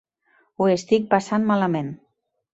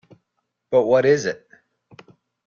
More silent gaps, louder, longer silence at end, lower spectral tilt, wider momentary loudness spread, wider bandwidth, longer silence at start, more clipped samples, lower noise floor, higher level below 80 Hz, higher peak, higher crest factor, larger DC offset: neither; about the same, -21 LUFS vs -19 LUFS; second, 0.6 s vs 1.15 s; about the same, -6.5 dB/octave vs -5.5 dB/octave; about the same, 11 LU vs 13 LU; about the same, 8 kHz vs 7.4 kHz; about the same, 0.6 s vs 0.7 s; neither; second, -63 dBFS vs -76 dBFS; about the same, -64 dBFS vs -66 dBFS; about the same, -4 dBFS vs -6 dBFS; about the same, 20 dB vs 18 dB; neither